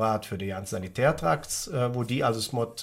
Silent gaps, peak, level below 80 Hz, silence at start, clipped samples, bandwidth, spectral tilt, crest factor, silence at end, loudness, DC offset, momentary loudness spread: none; -10 dBFS; -52 dBFS; 0 s; under 0.1%; 16.5 kHz; -5 dB/octave; 18 dB; 0 s; -28 LUFS; under 0.1%; 8 LU